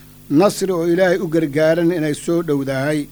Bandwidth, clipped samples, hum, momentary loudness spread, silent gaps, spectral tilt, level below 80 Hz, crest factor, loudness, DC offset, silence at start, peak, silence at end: over 20 kHz; under 0.1%; none; 5 LU; none; -6 dB/octave; -50 dBFS; 16 dB; -17 LUFS; under 0.1%; 0.3 s; -2 dBFS; 0 s